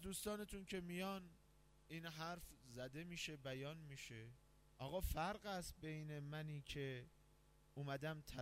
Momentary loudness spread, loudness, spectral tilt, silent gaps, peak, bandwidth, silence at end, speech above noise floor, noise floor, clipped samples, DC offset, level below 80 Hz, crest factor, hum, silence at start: 10 LU; -50 LUFS; -4.5 dB/octave; none; -32 dBFS; 16 kHz; 0 s; 22 dB; -72 dBFS; under 0.1%; under 0.1%; -62 dBFS; 18 dB; none; 0 s